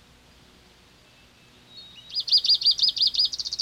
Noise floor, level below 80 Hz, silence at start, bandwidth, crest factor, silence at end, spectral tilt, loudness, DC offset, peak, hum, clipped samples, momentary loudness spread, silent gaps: -55 dBFS; -62 dBFS; 1.75 s; 16.5 kHz; 16 dB; 0 s; 1 dB/octave; -20 LUFS; under 0.1%; -10 dBFS; none; under 0.1%; 13 LU; none